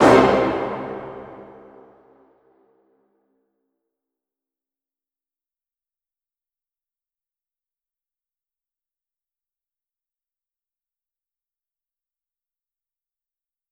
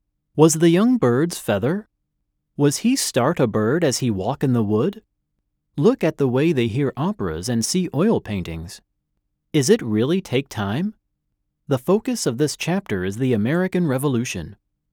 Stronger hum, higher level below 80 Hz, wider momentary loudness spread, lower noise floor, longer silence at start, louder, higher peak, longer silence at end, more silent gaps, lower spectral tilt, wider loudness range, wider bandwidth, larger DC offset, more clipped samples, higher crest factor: neither; about the same, -54 dBFS vs -54 dBFS; first, 28 LU vs 10 LU; first, under -90 dBFS vs -75 dBFS; second, 0 s vs 0.35 s; about the same, -19 LUFS vs -20 LUFS; about the same, -2 dBFS vs 0 dBFS; first, 12.3 s vs 0.4 s; neither; about the same, -6 dB/octave vs -5.5 dB/octave; first, 25 LU vs 4 LU; second, 13 kHz vs over 20 kHz; neither; neither; first, 26 dB vs 20 dB